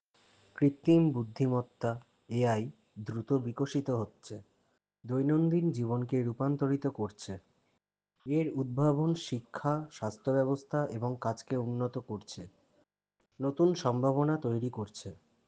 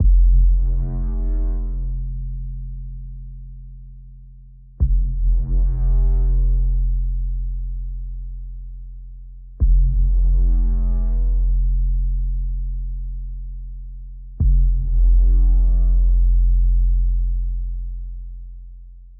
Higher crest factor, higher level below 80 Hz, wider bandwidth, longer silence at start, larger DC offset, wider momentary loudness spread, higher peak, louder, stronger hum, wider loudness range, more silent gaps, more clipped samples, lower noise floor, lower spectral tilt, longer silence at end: first, 18 dB vs 10 dB; second, -72 dBFS vs -18 dBFS; first, 9.2 kHz vs 1 kHz; first, 0.55 s vs 0 s; neither; second, 16 LU vs 20 LU; second, -14 dBFS vs -8 dBFS; second, -32 LUFS vs -22 LUFS; neither; second, 3 LU vs 9 LU; neither; neither; first, -80 dBFS vs -42 dBFS; second, -8 dB/octave vs -15 dB/octave; first, 0.35 s vs 0.05 s